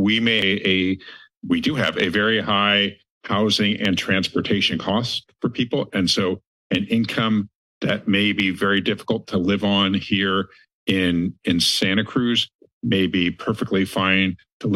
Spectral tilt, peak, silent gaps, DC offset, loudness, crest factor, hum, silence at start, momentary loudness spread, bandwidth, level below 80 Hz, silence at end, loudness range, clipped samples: -4.5 dB/octave; -4 dBFS; 1.37-1.41 s, 3.11-3.21 s, 6.47-6.70 s, 7.55-7.81 s, 10.74-10.86 s, 12.55-12.59 s, 12.73-12.81 s, 14.53-14.60 s; under 0.1%; -20 LUFS; 16 dB; none; 0 s; 8 LU; 12.5 kHz; -56 dBFS; 0 s; 2 LU; under 0.1%